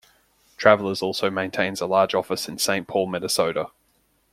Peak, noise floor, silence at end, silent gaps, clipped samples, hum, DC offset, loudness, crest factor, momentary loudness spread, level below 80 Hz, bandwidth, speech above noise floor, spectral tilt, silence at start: 0 dBFS; -65 dBFS; 0.65 s; none; under 0.1%; none; under 0.1%; -22 LUFS; 24 dB; 7 LU; -64 dBFS; 16.5 kHz; 43 dB; -3.5 dB/octave; 0.6 s